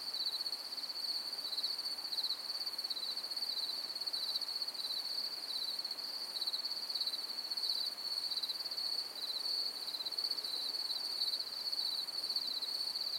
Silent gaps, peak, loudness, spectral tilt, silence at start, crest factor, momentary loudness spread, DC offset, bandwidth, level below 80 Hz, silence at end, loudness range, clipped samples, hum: none; -22 dBFS; -36 LUFS; 1.5 dB/octave; 0 s; 16 dB; 3 LU; under 0.1%; 16.5 kHz; under -90 dBFS; 0 s; 1 LU; under 0.1%; none